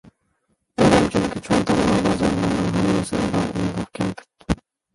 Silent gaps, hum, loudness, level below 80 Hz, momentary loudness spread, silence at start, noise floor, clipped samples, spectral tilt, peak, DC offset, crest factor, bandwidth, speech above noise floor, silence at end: none; none; -21 LUFS; -40 dBFS; 11 LU; 0.8 s; -69 dBFS; under 0.1%; -6 dB/octave; -2 dBFS; under 0.1%; 18 dB; 11.5 kHz; 50 dB; 0.4 s